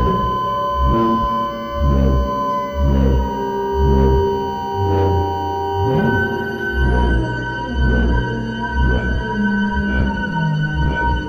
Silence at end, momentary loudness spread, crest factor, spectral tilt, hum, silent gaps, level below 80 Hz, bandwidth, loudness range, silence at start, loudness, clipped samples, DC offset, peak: 0 s; 5 LU; 14 dB; -8 dB/octave; none; none; -22 dBFS; 16 kHz; 1 LU; 0 s; -18 LUFS; under 0.1%; under 0.1%; -2 dBFS